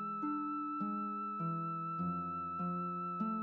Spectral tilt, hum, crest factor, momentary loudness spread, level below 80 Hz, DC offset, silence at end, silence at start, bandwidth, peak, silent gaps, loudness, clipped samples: -9 dB/octave; none; 12 dB; 1 LU; -76 dBFS; under 0.1%; 0 s; 0 s; 4.2 kHz; -28 dBFS; none; -39 LUFS; under 0.1%